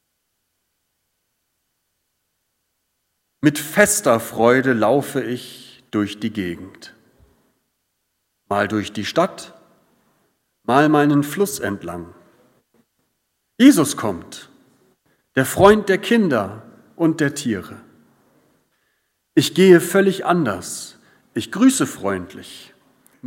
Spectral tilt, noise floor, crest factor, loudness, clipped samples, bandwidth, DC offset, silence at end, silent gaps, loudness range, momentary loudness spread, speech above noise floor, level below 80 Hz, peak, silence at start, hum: -5 dB/octave; -73 dBFS; 20 dB; -18 LUFS; under 0.1%; 16.5 kHz; under 0.1%; 0 s; none; 8 LU; 19 LU; 55 dB; -56 dBFS; 0 dBFS; 3.45 s; none